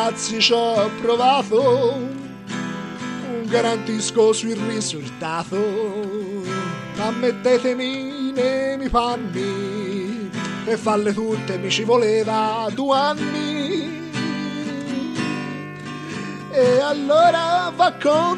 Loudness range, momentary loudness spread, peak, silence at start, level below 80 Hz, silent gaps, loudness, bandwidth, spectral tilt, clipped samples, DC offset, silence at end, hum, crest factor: 4 LU; 11 LU; -2 dBFS; 0 s; -50 dBFS; none; -21 LUFS; 11.5 kHz; -4.5 dB/octave; under 0.1%; under 0.1%; 0 s; none; 18 dB